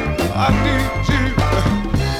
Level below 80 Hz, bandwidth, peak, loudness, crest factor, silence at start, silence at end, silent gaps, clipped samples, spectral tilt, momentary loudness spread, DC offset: -24 dBFS; 15 kHz; -2 dBFS; -18 LUFS; 14 dB; 0 s; 0 s; none; under 0.1%; -6 dB/octave; 3 LU; under 0.1%